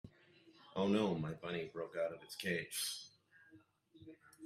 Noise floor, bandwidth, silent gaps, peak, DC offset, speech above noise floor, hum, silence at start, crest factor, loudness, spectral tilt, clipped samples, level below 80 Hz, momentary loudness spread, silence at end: -67 dBFS; 15.5 kHz; none; -22 dBFS; under 0.1%; 27 dB; none; 0.05 s; 20 dB; -40 LUFS; -4.5 dB/octave; under 0.1%; -76 dBFS; 24 LU; 0 s